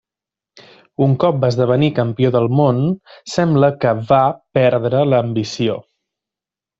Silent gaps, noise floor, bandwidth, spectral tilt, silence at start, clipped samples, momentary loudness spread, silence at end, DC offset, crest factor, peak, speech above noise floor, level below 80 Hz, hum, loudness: none; -88 dBFS; 8 kHz; -7.5 dB/octave; 1 s; under 0.1%; 7 LU; 1 s; under 0.1%; 16 dB; -2 dBFS; 73 dB; -54 dBFS; none; -16 LUFS